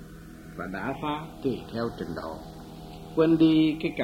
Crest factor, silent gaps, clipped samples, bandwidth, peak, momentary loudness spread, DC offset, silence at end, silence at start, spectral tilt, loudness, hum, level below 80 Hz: 18 dB; none; under 0.1%; 13 kHz; -10 dBFS; 23 LU; under 0.1%; 0 s; 0 s; -7.5 dB/octave; -27 LUFS; 50 Hz at -50 dBFS; -50 dBFS